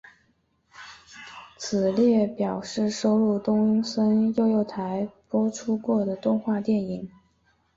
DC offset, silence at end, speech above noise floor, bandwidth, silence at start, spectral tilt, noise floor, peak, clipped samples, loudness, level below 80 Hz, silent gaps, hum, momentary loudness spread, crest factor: under 0.1%; 0.7 s; 44 dB; 7.8 kHz; 0.8 s; -6.5 dB/octave; -68 dBFS; -12 dBFS; under 0.1%; -24 LUFS; -64 dBFS; none; none; 21 LU; 14 dB